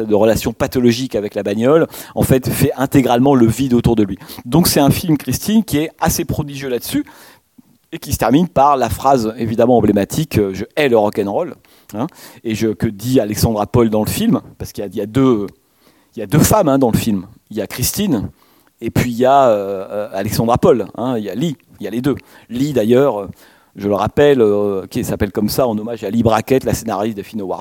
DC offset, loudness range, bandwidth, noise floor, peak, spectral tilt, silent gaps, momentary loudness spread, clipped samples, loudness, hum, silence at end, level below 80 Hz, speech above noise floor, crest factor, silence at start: under 0.1%; 4 LU; 17.5 kHz; -53 dBFS; 0 dBFS; -6 dB/octave; none; 13 LU; under 0.1%; -16 LUFS; none; 0 s; -38 dBFS; 38 dB; 16 dB; 0 s